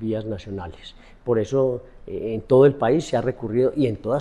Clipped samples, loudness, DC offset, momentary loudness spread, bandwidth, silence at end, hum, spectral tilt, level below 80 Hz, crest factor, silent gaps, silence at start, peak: under 0.1%; -21 LUFS; under 0.1%; 18 LU; 10 kHz; 0 s; none; -7.5 dB/octave; -48 dBFS; 16 dB; none; 0 s; -4 dBFS